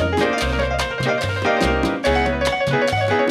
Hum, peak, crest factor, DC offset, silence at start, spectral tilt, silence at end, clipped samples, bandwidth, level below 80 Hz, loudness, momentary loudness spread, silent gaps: none; -6 dBFS; 14 dB; under 0.1%; 0 s; -5 dB/octave; 0 s; under 0.1%; 15 kHz; -30 dBFS; -19 LUFS; 2 LU; none